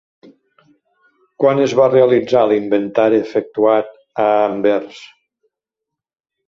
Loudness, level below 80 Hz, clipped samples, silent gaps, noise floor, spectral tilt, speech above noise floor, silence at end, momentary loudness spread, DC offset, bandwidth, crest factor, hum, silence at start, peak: -15 LUFS; -62 dBFS; under 0.1%; none; -83 dBFS; -6.5 dB/octave; 69 dB; 1.4 s; 7 LU; under 0.1%; 7.4 kHz; 16 dB; none; 1.4 s; 0 dBFS